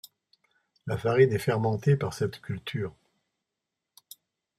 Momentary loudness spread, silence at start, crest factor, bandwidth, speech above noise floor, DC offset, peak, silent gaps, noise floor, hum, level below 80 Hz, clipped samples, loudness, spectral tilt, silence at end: 13 LU; 0.85 s; 20 dB; 15 kHz; 60 dB; under 0.1%; -10 dBFS; none; -86 dBFS; none; -64 dBFS; under 0.1%; -27 LUFS; -7 dB/octave; 1.7 s